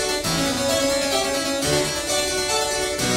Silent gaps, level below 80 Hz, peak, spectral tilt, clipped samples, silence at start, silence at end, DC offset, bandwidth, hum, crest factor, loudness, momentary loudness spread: none; -42 dBFS; -8 dBFS; -2.5 dB/octave; under 0.1%; 0 s; 0 s; under 0.1%; 16 kHz; none; 14 dB; -21 LUFS; 2 LU